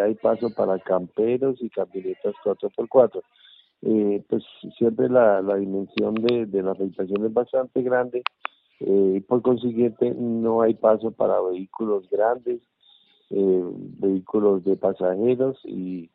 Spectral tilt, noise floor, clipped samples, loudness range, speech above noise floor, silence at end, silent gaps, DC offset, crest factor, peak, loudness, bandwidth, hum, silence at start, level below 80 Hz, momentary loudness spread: -6 dB/octave; -58 dBFS; under 0.1%; 3 LU; 36 dB; 0.1 s; none; under 0.1%; 20 dB; -2 dBFS; -23 LUFS; 5.2 kHz; none; 0 s; -68 dBFS; 10 LU